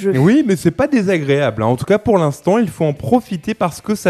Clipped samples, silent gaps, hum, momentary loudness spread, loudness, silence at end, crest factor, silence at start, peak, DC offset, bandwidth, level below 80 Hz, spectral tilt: under 0.1%; none; none; 7 LU; -16 LUFS; 0 s; 14 dB; 0 s; 0 dBFS; under 0.1%; 14 kHz; -46 dBFS; -7 dB/octave